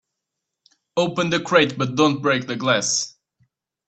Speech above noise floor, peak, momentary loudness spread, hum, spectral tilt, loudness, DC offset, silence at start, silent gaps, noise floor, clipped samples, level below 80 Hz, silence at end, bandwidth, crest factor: 62 dB; 0 dBFS; 6 LU; none; -3.5 dB/octave; -20 LUFS; under 0.1%; 0.95 s; none; -82 dBFS; under 0.1%; -64 dBFS; 0.8 s; 9.2 kHz; 22 dB